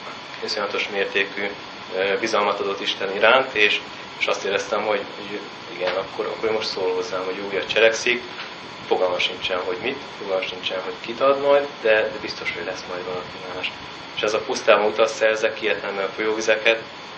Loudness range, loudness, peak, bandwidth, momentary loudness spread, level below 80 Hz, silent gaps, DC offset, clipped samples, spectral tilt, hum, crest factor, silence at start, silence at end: 4 LU; -22 LUFS; 0 dBFS; 8.6 kHz; 13 LU; -62 dBFS; none; under 0.1%; under 0.1%; -2.5 dB/octave; none; 22 dB; 0 s; 0 s